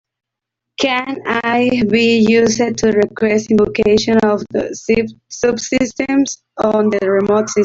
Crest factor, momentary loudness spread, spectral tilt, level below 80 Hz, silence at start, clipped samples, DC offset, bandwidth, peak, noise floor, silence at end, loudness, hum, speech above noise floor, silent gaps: 12 dB; 7 LU; -4.5 dB/octave; -46 dBFS; 0.8 s; under 0.1%; under 0.1%; 7.8 kHz; -2 dBFS; -80 dBFS; 0 s; -15 LUFS; none; 66 dB; none